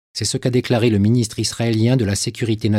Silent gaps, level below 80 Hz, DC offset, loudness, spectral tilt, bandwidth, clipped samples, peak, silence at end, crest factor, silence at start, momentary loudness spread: none; -50 dBFS; under 0.1%; -18 LUFS; -5.5 dB/octave; 15 kHz; under 0.1%; -4 dBFS; 0 s; 14 dB; 0.15 s; 5 LU